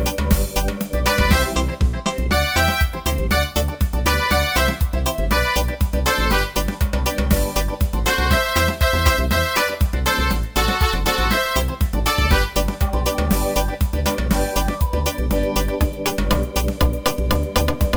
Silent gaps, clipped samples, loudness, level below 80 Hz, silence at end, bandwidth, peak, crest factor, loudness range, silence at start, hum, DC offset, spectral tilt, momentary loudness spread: none; under 0.1%; -20 LUFS; -22 dBFS; 0 s; over 20 kHz; -2 dBFS; 16 dB; 2 LU; 0 s; none; under 0.1%; -4.5 dB/octave; 5 LU